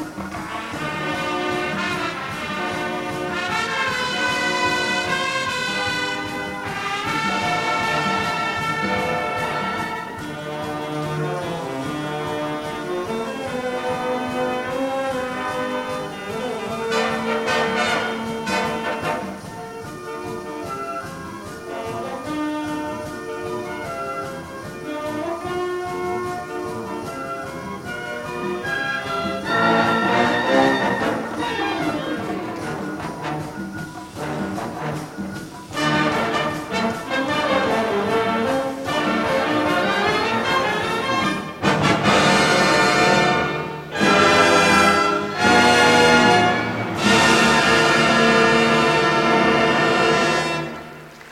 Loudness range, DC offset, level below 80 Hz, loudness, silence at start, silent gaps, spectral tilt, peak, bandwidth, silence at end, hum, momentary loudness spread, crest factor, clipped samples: 13 LU; under 0.1%; -50 dBFS; -20 LUFS; 0 s; none; -4 dB/octave; -2 dBFS; 16.5 kHz; 0 s; none; 15 LU; 20 dB; under 0.1%